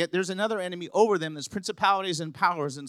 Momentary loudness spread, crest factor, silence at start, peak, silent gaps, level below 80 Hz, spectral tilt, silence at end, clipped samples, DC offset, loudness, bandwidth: 9 LU; 20 dB; 0 s; -8 dBFS; none; -72 dBFS; -4 dB/octave; 0 s; under 0.1%; under 0.1%; -27 LUFS; 13 kHz